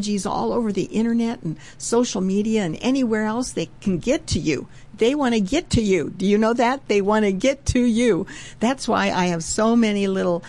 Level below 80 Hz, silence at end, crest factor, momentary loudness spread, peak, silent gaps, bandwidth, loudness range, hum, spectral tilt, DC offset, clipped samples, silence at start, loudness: -42 dBFS; 0 s; 14 dB; 7 LU; -6 dBFS; none; 11.5 kHz; 3 LU; none; -5 dB/octave; 0.5%; under 0.1%; 0 s; -21 LUFS